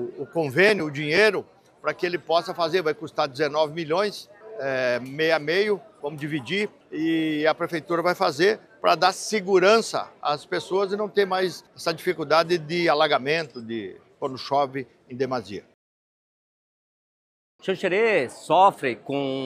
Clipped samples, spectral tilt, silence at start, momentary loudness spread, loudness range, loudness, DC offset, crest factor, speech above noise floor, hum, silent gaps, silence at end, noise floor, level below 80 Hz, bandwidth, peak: under 0.1%; -4.5 dB/octave; 0 s; 13 LU; 8 LU; -24 LUFS; under 0.1%; 20 dB; over 66 dB; none; 15.74-17.59 s; 0 s; under -90 dBFS; -72 dBFS; 15 kHz; -4 dBFS